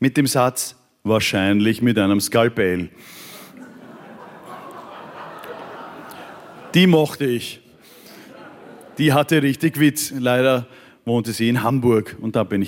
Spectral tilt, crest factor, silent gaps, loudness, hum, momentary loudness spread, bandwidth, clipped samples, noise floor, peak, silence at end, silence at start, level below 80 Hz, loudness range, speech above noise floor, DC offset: -5 dB/octave; 18 dB; none; -19 LUFS; none; 22 LU; 17 kHz; under 0.1%; -46 dBFS; -4 dBFS; 0 s; 0 s; -62 dBFS; 16 LU; 28 dB; under 0.1%